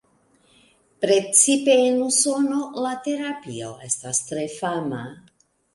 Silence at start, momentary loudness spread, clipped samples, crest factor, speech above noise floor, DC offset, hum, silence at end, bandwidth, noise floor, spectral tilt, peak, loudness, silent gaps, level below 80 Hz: 1 s; 16 LU; under 0.1%; 22 dB; 39 dB; under 0.1%; none; 0.6 s; 11.5 kHz; -61 dBFS; -2.5 dB/octave; -2 dBFS; -21 LUFS; none; -68 dBFS